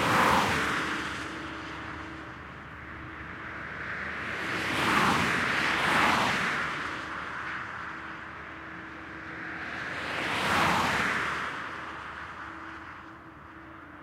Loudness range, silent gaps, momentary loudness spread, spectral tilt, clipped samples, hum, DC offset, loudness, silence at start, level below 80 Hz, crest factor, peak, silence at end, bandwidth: 10 LU; none; 18 LU; -3.5 dB/octave; under 0.1%; none; under 0.1%; -29 LUFS; 0 s; -56 dBFS; 20 dB; -12 dBFS; 0 s; 16.5 kHz